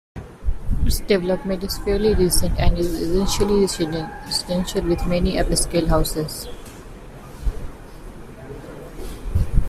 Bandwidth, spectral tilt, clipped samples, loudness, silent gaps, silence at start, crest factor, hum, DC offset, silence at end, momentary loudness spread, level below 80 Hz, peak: 15.5 kHz; -5 dB/octave; under 0.1%; -22 LUFS; none; 0.15 s; 18 dB; none; under 0.1%; 0 s; 20 LU; -26 dBFS; -4 dBFS